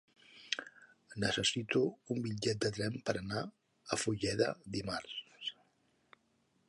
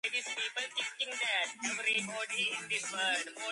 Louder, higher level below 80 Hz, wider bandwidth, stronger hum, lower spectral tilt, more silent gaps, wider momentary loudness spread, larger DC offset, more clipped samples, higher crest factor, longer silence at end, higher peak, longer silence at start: second, -37 LUFS vs -33 LUFS; first, -64 dBFS vs -84 dBFS; about the same, 11.5 kHz vs 11.5 kHz; neither; first, -4 dB/octave vs 0 dB/octave; neither; first, 13 LU vs 4 LU; neither; neither; first, 24 dB vs 16 dB; first, 1.15 s vs 0 s; first, -14 dBFS vs -20 dBFS; first, 0.3 s vs 0.05 s